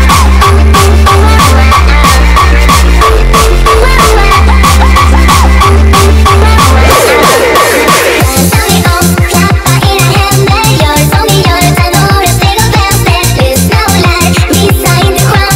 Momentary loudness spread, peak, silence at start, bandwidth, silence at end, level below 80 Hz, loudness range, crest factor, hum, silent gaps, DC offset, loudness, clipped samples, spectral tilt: 2 LU; 0 dBFS; 0 s; 16.5 kHz; 0 s; -8 dBFS; 2 LU; 4 dB; none; none; under 0.1%; -5 LUFS; 7%; -4.5 dB/octave